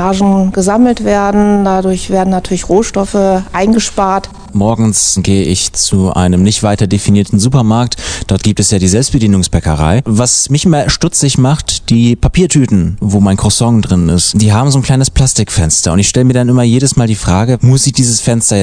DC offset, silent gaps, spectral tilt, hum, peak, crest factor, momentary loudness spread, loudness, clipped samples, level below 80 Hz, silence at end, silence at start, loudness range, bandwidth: under 0.1%; none; -5 dB/octave; none; 0 dBFS; 10 dB; 4 LU; -10 LUFS; 0.9%; -26 dBFS; 0 s; 0 s; 2 LU; 10 kHz